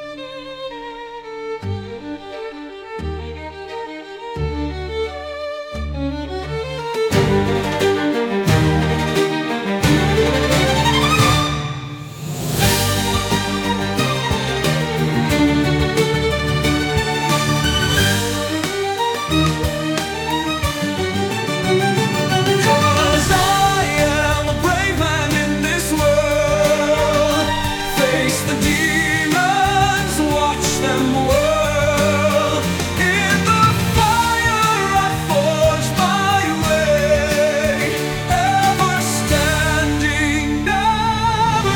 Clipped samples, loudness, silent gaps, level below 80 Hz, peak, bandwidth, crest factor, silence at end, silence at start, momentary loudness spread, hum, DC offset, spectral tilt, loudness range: under 0.1%; -17 LUFS; none; -32 dBFS; -2 dBFS; 19.5 kHz; 16 dB; 0 s; 0 s; 12 LU; none; under 0.1%; -4.5 dB/octave; 10 LU